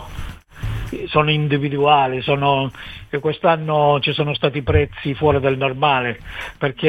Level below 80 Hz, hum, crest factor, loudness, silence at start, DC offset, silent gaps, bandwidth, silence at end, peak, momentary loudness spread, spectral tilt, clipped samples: -36 dBFS; none; 16 dB; -18 LUFS; 0 s; under 0.1%; none; 11 kHz; 0 s; -2 dBFS; 13 LU; -7.5 dB/octave; under 0.1%